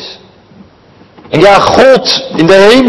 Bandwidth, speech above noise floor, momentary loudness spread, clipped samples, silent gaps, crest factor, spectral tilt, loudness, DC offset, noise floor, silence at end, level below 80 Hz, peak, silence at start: 12 kHz; 35 dB; 9 LU; 9%; none; 8 dB; -4.5 dB/octave; -6 LUFS; under 0.1%; -40 dBFS; 0 s; -38 dBFS; 0 dBFS; 0 s